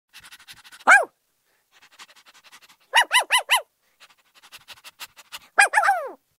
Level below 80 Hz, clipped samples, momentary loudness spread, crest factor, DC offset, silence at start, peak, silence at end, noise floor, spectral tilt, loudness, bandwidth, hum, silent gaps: -80 dBFS; under 0.1%; 25 LU; 24 dB; under 0.1%; 0.5 s; 0 dBFS; 0.25 s; -69 dBFS; 2.5 dB/octave; -19 LUFS; 16 kHz; none; none